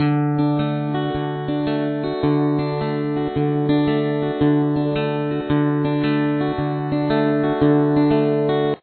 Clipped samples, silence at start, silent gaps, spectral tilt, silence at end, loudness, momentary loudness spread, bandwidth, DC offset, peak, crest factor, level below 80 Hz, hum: under 0.1%; 0 s; none; -11.5 dB/octave; 0.05 s; -20 LUFS; 6 LU; 4.5 kHz; under 0.1%; -6 dBFS; 14 dB; -48 dBFS; none